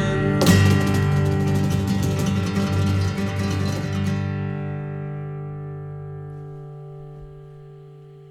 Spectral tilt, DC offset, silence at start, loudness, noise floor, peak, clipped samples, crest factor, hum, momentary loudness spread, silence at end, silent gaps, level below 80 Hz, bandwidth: -6.5 dB/octave; under 0.1%; 0 s; -22 LUFS; -43 dBFS; -4 dBFS; under 0.1%; 18 dB; none; 22 LU; 0 s; none; -44 dBFS; 16.5 kHz